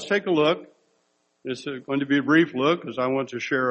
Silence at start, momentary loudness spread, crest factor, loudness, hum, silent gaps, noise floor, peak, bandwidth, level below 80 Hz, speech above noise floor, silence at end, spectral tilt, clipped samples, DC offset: 0 s; 13 LU; 18 dB; -24 LUFS; none; none; -69 dBFS; -6 dBFS; 8.4 kHz; -70 dBFS; 46 dB; 0 s; -5.5 dB/octave; under 0.1%; under 0.1%